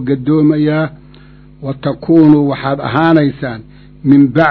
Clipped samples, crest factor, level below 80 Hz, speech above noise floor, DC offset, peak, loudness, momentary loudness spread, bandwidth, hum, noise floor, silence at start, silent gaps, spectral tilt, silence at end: 0.6%; 12 dB; -44 dBFS; 28 dB; under 0.1%; 0 dBFS; -12 LUFS; 15 LU; 4.6 kHz; none; -39 dBFS; 0 s; none; -10 dB/octave; 0 s